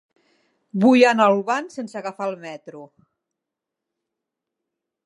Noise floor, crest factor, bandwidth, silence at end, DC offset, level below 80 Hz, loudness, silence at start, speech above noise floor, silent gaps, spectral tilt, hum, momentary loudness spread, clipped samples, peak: -85 dBFS; 22 dB; 11 kHz; 2.2 s; under 0.1%; -82 dBFS; -19 LUFS; 0.75 s; 65 dB; none; -5.5 dB/octave; none; 22 LU; under 0.1%; -2 dBFS